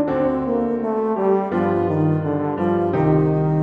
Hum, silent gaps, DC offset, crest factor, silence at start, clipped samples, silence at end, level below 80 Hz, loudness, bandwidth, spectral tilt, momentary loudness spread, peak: none; none; under 0.1%; 14 dB; 0 s; under 0.1%; 0 s; -46 dBFS; -20 LUFS; 4.3 kHz; -11 dB/octave; 4 LU; -6 dBFS